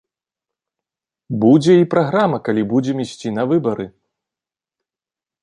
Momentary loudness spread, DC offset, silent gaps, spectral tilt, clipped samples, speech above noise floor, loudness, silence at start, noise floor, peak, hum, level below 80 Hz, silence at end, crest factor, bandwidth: 13 LU; under 0.1%; none; -7.5 dB/octave; under 0.1%; 74 dB; -16 LUFS; 1.3 s; -90 dBFS; -2 dBFS; none; -60 dBFS; 1.55 s; 16 dB; 10.5 kHz